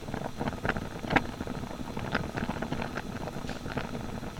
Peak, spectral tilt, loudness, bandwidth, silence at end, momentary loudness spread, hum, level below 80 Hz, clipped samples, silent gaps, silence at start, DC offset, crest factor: -6 dBFS; -5.5 dB/octave; -34 LUFS; 19 kHz; 0 s; 9 LU; none; -46 dBFS; under 0.1%; none; 0 s; under 0.1%; 28 dB